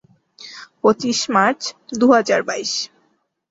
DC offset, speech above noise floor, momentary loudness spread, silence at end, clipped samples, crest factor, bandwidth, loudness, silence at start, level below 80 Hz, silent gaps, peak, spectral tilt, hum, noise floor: under 0.1%; 47 dB; 21 LU; 0.65 s; under 0.1%; 18 dB; 8 kHz; -18 LUFS; 0.4 s; -62 dBFS; none; -2 dBFS; -3 dB/octave; none; -65 dBFS